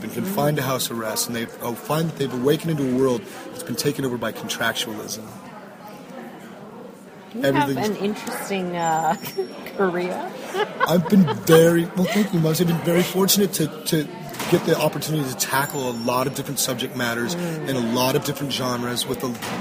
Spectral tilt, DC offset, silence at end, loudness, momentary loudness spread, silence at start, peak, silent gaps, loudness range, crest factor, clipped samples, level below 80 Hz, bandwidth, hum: -4.5 dB/octave; under 0.1%; 0 s; -22 LUFS; 17 LU; 0 s; -2 dBFS; none; 9 LU; 22 dB; under 0.1%; -58 dBFS; 15.5 kHz; none